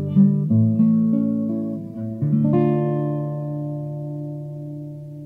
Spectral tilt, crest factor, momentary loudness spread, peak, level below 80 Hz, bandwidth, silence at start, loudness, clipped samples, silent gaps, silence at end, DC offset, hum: -12.5 dB/octave; 16 dB; 15 LU; -6 dBFS; -58 dBFS; 3.3 kHz; 0 s; -21 LUFS; under 0.1%; none; 0 s; under 0.1%; none